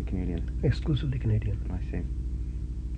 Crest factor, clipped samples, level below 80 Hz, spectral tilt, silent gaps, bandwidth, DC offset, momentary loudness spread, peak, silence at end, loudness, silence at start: 14 dB; under 0.1%; -32 dBFS; -8.5 dB/octave; none; 8.4 kHz; under 0.1%; 7 LU; -14 dBFS; 0 s; -31 LUFS; 0 s